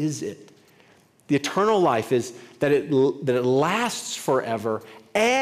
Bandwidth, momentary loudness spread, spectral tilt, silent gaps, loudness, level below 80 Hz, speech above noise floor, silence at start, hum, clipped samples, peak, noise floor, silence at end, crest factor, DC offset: 16 kHz; 9 LU; -5 dB/octave; none; -23 LUFS; -68 dBFS; 34 dB; 0 s; none; under 0.1%; -6 dBFS; -56 dBFS; 0 s; 16 dB; under 0.1%